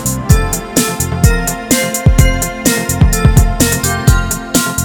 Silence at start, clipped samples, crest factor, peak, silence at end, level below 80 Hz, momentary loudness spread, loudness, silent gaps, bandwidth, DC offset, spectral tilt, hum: 0 s; 0.7%; 12 dB; 0 dBFS; 0 s; -16 dBFS; 4 LU; -12 LUFS; none; over 20 kHz; under 0.1%; -4.5 dB/octave; none